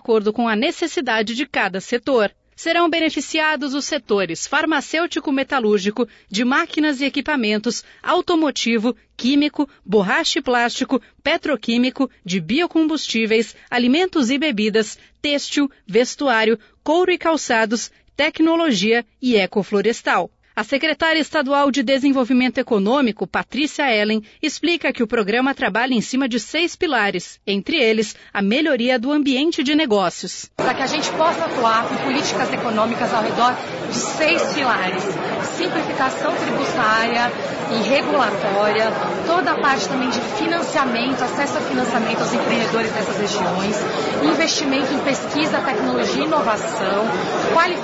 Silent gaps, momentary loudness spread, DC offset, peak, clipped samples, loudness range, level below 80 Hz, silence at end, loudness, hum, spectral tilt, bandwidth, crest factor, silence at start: none; 5 LU; under 0.1%; -4 dBFS; under 0.1%; 1 LU; -56 dBFS; 0 s; -19 LUFS; none; -4 dB/octave; 8 kHz; 14 dB; 0.1 s